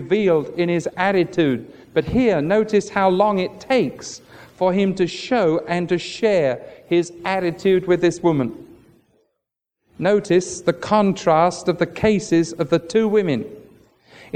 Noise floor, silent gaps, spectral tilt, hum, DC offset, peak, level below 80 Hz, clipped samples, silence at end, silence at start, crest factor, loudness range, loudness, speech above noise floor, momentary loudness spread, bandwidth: -80 dBFS; none; -6 dB/octave; none; under 0.1%; -4 dBFS; -50 dBFS; under 0.1%; 0.1 s; 0 s; 16 dB; 3 LU; -19 LUFS; 61 dB; 7 LU; 9.8 kHz